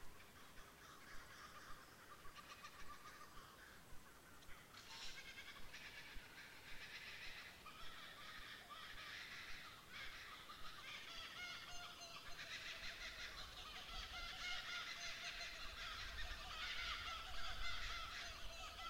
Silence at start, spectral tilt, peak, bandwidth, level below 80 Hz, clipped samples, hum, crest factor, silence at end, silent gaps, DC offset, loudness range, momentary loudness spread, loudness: 0 s; -1.5 dB/octave; -32 dBFS; 16 kHz; -62 dBFS; under 0.1%; none; 20 dB; 0 s; none; under 0.1%; 11 LU; 13 LU; -52 LUFS